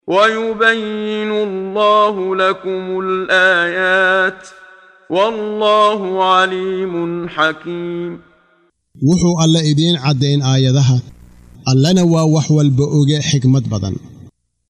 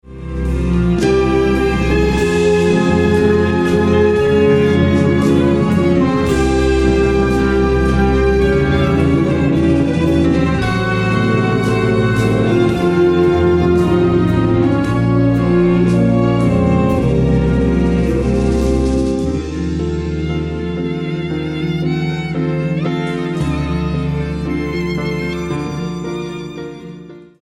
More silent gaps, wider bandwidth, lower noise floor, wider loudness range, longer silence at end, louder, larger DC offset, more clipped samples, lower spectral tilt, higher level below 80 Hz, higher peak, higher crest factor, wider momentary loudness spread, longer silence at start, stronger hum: neither; second, 10 kHz vs 12 kHz; first, -57 dBFS vs -35 dBFS; second, 3 LU vs 6 LU; first, 0.4 s vs 0.2 s; about the same, -14 LUFS vs -15 LUFS; second, under 0.1% vs 0.3%; neither; second, -5.5 dB/octave vs -7.5 dB/octave; second, -48 dBFS vs -26 dBFS; about the same, 0 dBFS vs -2 dBFS; about the same, 14 dB vs 12 dB; about the same, 9 LU vs 8 LU; about the same, 0.05 s vs 0.05 s; neither